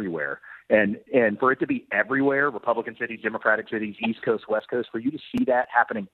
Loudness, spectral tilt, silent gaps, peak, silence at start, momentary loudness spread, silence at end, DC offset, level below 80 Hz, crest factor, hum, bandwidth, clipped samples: -24 LUFS; -8 dB/octave; none; -6 dBFS; 0 s; 8 LU; 0.1 s; under 0.1%; -64 dBFS; 20 dB; none; 4.8 kHz; under 0.1%